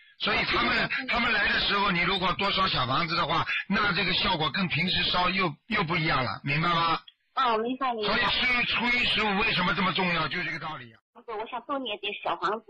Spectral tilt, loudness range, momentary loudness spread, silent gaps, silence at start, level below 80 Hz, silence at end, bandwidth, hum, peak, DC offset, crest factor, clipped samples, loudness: -5.5 dB/octave; 2 LU; 9 LU; 11.01-11.13 s; 0.2 s; -48 dBFS; 0.1 s; 10 kHz; none; -14 dBFS; under 0.1%; 12 dB; under 0.1%; -25 LUFS